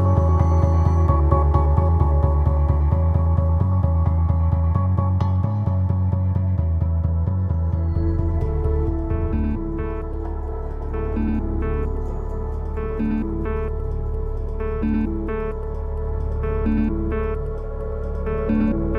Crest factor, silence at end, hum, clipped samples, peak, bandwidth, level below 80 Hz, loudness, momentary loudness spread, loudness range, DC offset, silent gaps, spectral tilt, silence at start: 16 dB; 0 s; none; under 0.1%; -4 dBFS; 3.2 kHz; -24 dBFS; -22 LUFS; 10 LU; 7 LU; under 0.1%; none; -11 dB/octave; 0 s